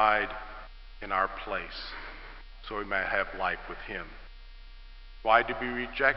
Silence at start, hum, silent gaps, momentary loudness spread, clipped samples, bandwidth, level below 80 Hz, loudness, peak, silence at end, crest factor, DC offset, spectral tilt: 0 s; none; none; 22 LU; under 0.1%; 6 kHz; -46 dBFS; -30 LUFS; -8 dBFS; 0 s; 24 dB; 0.1%; -7 dB/octave